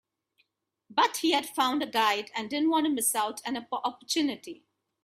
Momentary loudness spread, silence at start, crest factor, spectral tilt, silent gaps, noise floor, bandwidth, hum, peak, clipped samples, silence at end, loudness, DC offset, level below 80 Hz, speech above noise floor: 8 LU; 0.9 s; 20 dB; -1 dB/octave; none; -75 dBFS; 16 kHz; none; -10 dBFS; under 0.1%; 0.5 s; -28 LUFS; under 0.1%; -78 dBFS; 47 dB